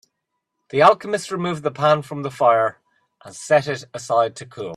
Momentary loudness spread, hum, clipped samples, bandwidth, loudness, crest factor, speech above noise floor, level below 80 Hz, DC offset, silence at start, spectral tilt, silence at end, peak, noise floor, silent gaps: 14 LU; none; under 0.1%; 12.5 kHz; -20 LUFS; 20 dB; 58 dB; -66 dBFS; under 0.1%; 0.75 s; -5 dB/octave; 0 s; 0 dBFS; -78 dBFS; none